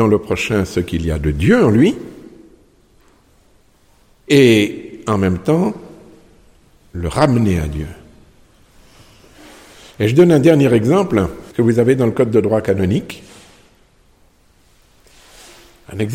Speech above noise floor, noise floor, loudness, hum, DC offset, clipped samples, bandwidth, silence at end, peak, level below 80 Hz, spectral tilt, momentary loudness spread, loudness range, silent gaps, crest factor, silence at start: 39 dB; -52 dBFS; -15 LUFS; none; under 0.1%; under 0.1%; 16 kHz; 0 s; 0 dBFS; -36 dBFS; -7 dB/octave; 16 LU; 8 LU; none; 16 dB; 0 s